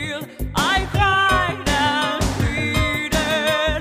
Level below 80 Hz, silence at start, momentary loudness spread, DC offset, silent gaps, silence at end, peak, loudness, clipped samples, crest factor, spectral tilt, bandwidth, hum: -30 dBFS; 0 s; 5 LU; under 0.1%; none; 0 s; -4 dBFS; -19 LUFS; under 0.1%; 14 dB; -4 dB/octave; 15.5 kHz; none